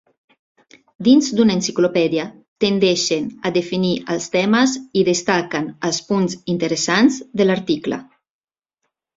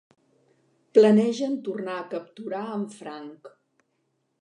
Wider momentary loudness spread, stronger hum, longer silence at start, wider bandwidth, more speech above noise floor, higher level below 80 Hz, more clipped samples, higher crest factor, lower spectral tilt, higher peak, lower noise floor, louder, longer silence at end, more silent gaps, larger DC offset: second, 8 LU vs 21 LU; neither; about the same, 1 s vs 0.95 s; second, 7.8 kHz vs 10 kHz; first, 59 dB vs 50 dB; first, -58 dBFS vs -80 dBFS; neither; about the same, 18 dB vs 22 dB; second, -4.5 dB/octave vs -6.5 dB/octave; about the same, -2 dBFS vs -4 dBFS; about the same, -77 dBFS vs -74 dBFS; first, -18 LUFS vs -24 LUFS; first, 1.15 s vs 0.95 s; first, 2.48-2.56 s vs none; neither